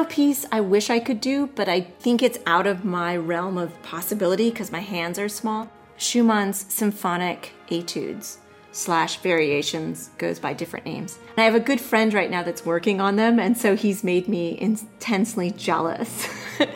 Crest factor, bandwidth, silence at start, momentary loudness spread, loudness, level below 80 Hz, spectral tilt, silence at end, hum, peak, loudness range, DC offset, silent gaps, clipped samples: 18 dB; 16.5 kHz; 0 s; 11 LU; -23 LUFS; -66 dBFS; -4.5 dB/octave; 0 s; none; -6 dBFS; 4 LU; under 0.1%; none; under 0.1%